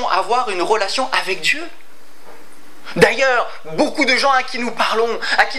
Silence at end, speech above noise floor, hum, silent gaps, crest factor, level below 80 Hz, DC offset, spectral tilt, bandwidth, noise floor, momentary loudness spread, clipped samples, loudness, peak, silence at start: 0 s; 28 dB; none; none; 18 dB; -56 dBFS; 5%; -3 dB/octave; 16 kHz; -45 dBFS; 9 LU; under 0.1%; -17 LUFS; 0 dBFS; 0 s